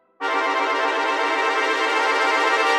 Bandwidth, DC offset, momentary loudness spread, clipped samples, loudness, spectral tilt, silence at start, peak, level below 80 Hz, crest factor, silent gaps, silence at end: 15.5 kHz; under 0.1%; 3 LU; under 0.1%; -20 LUFS; 0 dB/octave; 0.2 s; -8 dBFS; -74 dBFS; 14 dB; none; 0 s